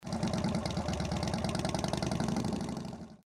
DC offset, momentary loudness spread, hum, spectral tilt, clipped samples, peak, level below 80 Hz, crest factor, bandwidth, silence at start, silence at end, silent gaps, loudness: under 0.1%; 5 LU; none; -5.5 dB/octave; under 0.1%; -20 dBFS; -48 dBFS; 14 dB; 15 kHz; 0 s; 0.1 s; none; -34 LUFS